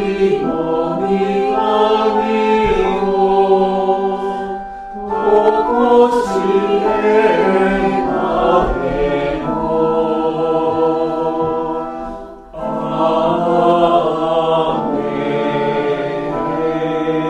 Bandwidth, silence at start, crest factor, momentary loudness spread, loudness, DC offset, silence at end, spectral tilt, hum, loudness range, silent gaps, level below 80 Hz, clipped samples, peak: 10 kHz; 0 s; 14 dB; 8 LU; -15 LUFS; under 0.1%; 0 s; -7 dB/octave; none; 4 LU; none; -38 dBFS; under 0.1%; 0 dBFS